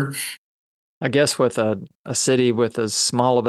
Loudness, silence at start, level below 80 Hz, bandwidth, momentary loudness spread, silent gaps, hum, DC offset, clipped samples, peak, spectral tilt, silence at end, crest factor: -20 LUFS; 0 s; -66 dBFS; 13 kHz; 11 LU; 0.38-1.01 s, 1.95-2.05 s; none; under 0.1%; under 0.1%; -2 dBFS; -4 dB/octave; 0 s; 18 dB